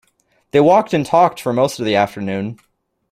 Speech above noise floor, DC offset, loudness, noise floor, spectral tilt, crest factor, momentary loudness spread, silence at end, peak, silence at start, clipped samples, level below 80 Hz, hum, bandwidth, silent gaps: 46 dB; under 0.1%; -16 LUFS; -62 dBFS; -6 dB/octave; 16 dB; 11 LU; 0.6 s; -2 dBFS; 0.55 s; under 0.1%; -58 dBFS; none; 15.5 kHz; none